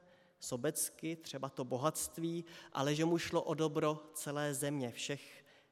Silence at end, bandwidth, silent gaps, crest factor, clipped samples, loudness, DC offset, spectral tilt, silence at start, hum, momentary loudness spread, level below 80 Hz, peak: 0.3 s; 16.5 kHz; none; 22 dB; under 0.1%; -38 LUFS; under 0.1%; -4.5 dB/octave; 0.4 s; none; 10 LU; -76 dBFS; -18 dBFS